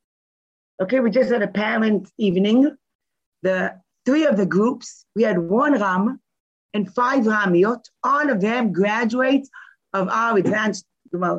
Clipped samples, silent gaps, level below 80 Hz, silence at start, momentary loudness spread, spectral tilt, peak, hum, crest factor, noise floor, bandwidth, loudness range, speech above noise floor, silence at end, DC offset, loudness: under 0.1%; 2.95-2.99 s, 3.26-3.32 s, 6.40-6.69 s; -68 dBFS; 0.8 s; 10 LU; -6.5 dB/octave; -6 dBFS; none; 14 dB; under -90 dBFS; 8.2 kHz; 1 LU; over 71 dB; 0 s; under 0.1%; -20 LUFS